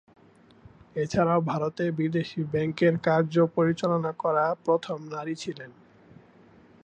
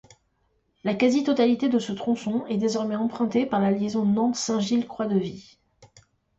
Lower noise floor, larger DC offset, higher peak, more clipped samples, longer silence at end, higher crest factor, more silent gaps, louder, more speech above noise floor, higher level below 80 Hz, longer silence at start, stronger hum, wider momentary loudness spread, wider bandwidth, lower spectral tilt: second, -55 dBFS vs -70 dBFS; neither; about the same, -10 dBFS vs -10 dBFS; neither; first, 1.15 s vs 0.55 s; about the same, 18 dB vs 16 dB; neither; about the same, -26 LUFS vs -24 LUFS; second, 29 dB vs 46 dB; about the same, -62 dBFS vs -64 dBFS; about the same, 0.95 s vs 0.85 s; neither; first, 11 LU vs 6 LU; about the same, 8.8 kHz vs 8.2 kHz; first, -7 dB/octave vs -5.5 dB/octave